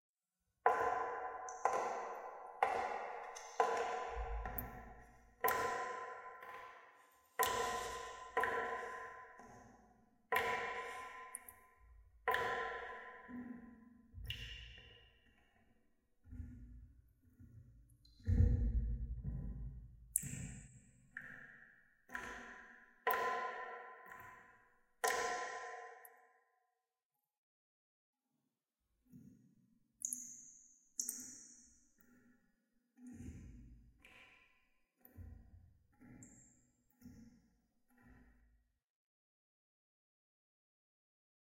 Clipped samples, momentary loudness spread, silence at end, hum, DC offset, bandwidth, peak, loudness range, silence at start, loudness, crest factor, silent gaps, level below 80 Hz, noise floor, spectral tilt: under 0.1%; 24 LU; 3.2 s; none; under 0.1%; 16 kHz; -14 dBFS; 19 LU; 0.65 s; -42 LUFS; 30 dB; 27.05-27.10 s, 27.38-28.13 s; -54 dBFS; under -90 dBFS; -3.5 dB/octave